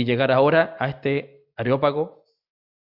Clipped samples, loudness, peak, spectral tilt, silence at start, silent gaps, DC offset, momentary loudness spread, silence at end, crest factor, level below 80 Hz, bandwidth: under 0.1%; -22 LUFS; -4 dBFS; -10 dB/octave; 0 s; none; under 0.1%; 12 LU; 0.8 s; 18 dB; -62 dBFS; 5.6 kHz